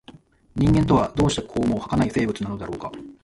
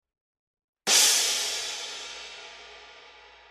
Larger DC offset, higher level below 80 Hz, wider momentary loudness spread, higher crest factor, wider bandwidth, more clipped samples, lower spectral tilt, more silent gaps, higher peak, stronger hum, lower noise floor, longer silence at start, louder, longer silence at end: neither; first, -38 dBFS vs -72 dBFS; second, 14 LU vs 24 LU; second, 16 dB vs 22 dB; second, 11.5 kHz vs 14 kHz; neither; first, -6.5 dB/octave vs 2.5 dB/octave; neither; about the same, -6 dBFS vs -6 dBFS; neither; about the same, -49 dBFS vs -51 dBFS; second, 0.1 s vs 0.85 s; about the same, -22 LUFS vs -22 LUFS; second, 0.1 s vs 0.4 s